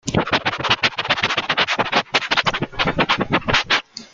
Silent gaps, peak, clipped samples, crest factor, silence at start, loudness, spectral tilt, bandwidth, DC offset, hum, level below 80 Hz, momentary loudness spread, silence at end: none; -2 dBFS; under 0.1%; 18 dB; 0.05 s; -18 LUFS; -3.5 dB/octave; 9.4 kHz; under 0.1%; none; -44 dBFS; 3 LU; 0.1 s